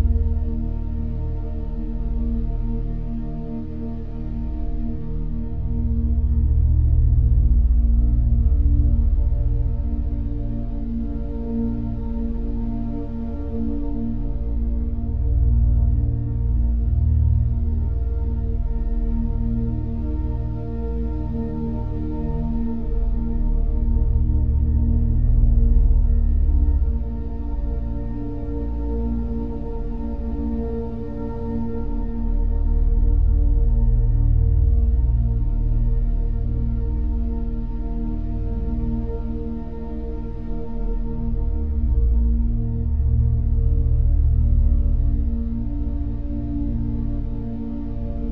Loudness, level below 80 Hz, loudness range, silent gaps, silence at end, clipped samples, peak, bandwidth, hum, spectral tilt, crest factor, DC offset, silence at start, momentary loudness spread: -24 LUFS; -20 dBFS; 7 LU; none; 0 s; under 0.1%; -4 dBFS; 1.9 kHz; none; -12.5 dB/octave; 16 dB; 2%; 0 s; 10 LU